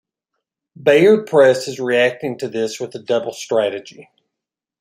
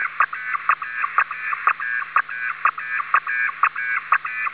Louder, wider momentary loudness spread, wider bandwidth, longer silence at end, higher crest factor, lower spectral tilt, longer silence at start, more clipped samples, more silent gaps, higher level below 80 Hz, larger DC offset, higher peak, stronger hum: first, -17 LUFS vs -21 LUFS; first, 12 LU vs 3 LU; first, 15 kHz vs 4 kHz; first, 0.8 s vs 0 s; about the same, 18 dB vs 20 dB; first, -5 dB/octave vs -3.5 dB/octave; first, 0.8 s vs 0 s; neither; neither; first, -66 dBFS vs -72 dBFS; second, under 0.1% vs 0.1%; first, 0 dBFS vs -4 dBFS; neither